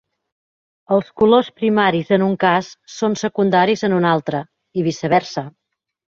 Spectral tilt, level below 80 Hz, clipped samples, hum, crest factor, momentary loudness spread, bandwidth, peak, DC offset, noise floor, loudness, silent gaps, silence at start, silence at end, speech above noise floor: -6 dB/octave; -58 dBFS; under 0.1%; none; 16 dB; 12 LU; 7.4 kHz; -2 dBFS; under 0.1%; under -90 dBFS; -18 LUFS; none; 0.9 s; 0.65 s; over 73 dB